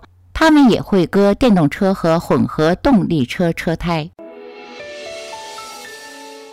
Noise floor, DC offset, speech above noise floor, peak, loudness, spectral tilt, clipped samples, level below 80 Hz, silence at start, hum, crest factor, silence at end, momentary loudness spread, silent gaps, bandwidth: -35 dBFS; under 0.1%; 21 dB; -6 dBFS; -15 LUFS; -6.5 dB/octave; under 0.1%; -38 dBFS; 0.35 s; none; 10 dB; 0 s; 21 LU; none; 16 kHz